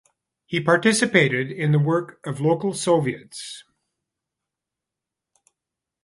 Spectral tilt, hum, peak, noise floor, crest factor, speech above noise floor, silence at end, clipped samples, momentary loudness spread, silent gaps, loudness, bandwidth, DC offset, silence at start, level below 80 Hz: -5 dB/octave; none; -2 dBFS; -86 dBFS; 22 dB; 65 dB; 2.45 s; under 0.1%; 17 LU; none; -21 LUFS; 11.5 kHz; under 0.1%; 0.5 s; -66 dBFS